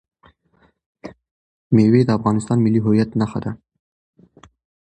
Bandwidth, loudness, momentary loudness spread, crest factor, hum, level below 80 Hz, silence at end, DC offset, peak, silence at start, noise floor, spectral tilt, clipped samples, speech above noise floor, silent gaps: 9.4 kHz; -18 LUFS; 25 LU; 18 dB; none; -52 dBFS; 1.35 s; under 0.1%; -2 dBFS; 1.05 s; -60 dBFS; -8.5 dB/octave; under 0.1%; 44 dB; 1.31-1.70 s